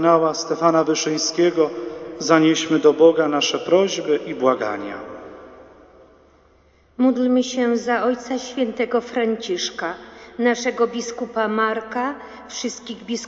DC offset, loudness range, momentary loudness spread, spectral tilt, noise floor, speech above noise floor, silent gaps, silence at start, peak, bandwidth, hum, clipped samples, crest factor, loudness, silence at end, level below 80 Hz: under 0.1%; 6 LU; 14 LU; -4 dB/octave; -55 dBFS; 36 dB; none; 0 s; 0 dBFS; 8 kHz; none; under 0.1%; 20 dB; -20 LUFS; 0 s; -62 dBFS